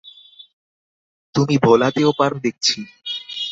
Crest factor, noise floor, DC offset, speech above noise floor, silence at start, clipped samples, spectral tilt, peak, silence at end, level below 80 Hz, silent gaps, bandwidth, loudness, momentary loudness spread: 18 dB; -44 dBFS; under 0.1%; 28 dB; 0.05 s; under 0.1%; -5 dB/octave; -2 dBFS; 0 s; -58 dBFS; 0.53-1.33 s; 7.8 kHz; -18 LUFS; 12 LU